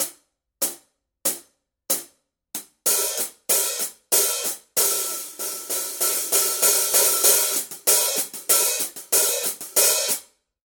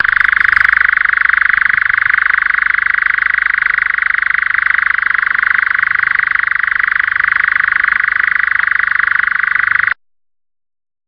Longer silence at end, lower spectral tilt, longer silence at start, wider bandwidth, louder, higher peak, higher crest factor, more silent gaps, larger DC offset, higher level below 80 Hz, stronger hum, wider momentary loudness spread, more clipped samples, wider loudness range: second, 0.4 s vs 1.15 s; second, 1.5 dB/octave vs -2.5 dB/octave; about the same, 0 s vs 0 s; first, 18 kHz vs 5.6 kHz; second, -20 LUFS vs -11 LUFS; about the same, -2 dBFS vs 0 dBFS; first, 22 dB vs 12 dB; neither; neither; second, -74 dBFS vs -46 dBFS; neither; first, 11 LU vs 3 LU; neither; first, 6 LU vs 1 LU